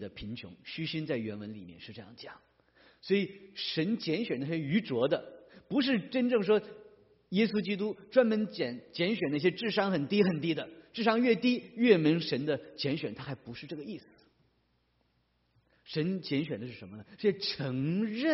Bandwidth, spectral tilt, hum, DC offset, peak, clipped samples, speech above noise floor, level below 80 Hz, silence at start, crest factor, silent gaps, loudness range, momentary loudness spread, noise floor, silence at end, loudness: 6 kHz; -4.5 dB/octave; none; under 0.1%; -10 dBFS; under 0.1%; 43 dB; -70 dBFS; 0 s; 22 dB; none; 10 LU; 17 LU; -74 dBFS; 0 s; -31 LUFS